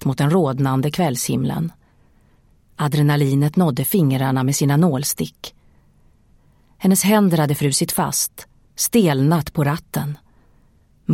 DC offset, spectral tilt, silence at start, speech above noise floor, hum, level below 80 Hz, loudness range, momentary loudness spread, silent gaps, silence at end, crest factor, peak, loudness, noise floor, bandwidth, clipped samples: under 0.1%; -5.5 dB/octave; 0 s; 37 dB; none; -50 dBFS; 3 LU; 10 LU; none; 0 s; 16 dB; -4 dBFS; -18 LUFS; -55 dBFS; 16.5 kHz; under 0.1%